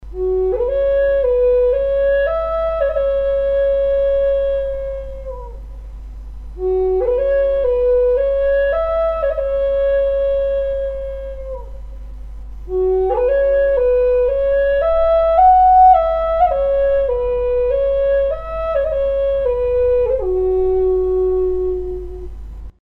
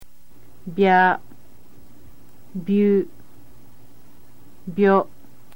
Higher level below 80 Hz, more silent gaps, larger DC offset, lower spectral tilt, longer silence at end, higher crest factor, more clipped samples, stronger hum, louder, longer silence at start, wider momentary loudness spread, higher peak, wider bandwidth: first, -30 dBFS vs -60 dBFS; neither; second, under 0.1% vs 2%; about the same, -8.5 dB/octave vs -8 dB/octave; second, 0.1 s vs 0.5 s; second, 14 dB vs 20 dB; neither; neither; first, -16 LUFS vs -20 LUFS; about the same, 0 s vs 0 s; about the same, 17 LU vs 19 LU; about the same, -2 dBFS vs -4 dBFS; second, 4.2 kHz vs 17 kHz